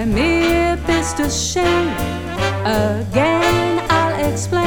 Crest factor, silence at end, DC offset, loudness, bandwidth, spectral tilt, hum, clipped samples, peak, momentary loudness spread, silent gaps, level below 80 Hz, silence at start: 14 dB; 0 s; under 0.1%; -17 LUFS; over 20 kHz; -4.5 dB/octave; none; under 0.1%; -2 dBFS; 6 LU; none; -30 dBFS; 0 s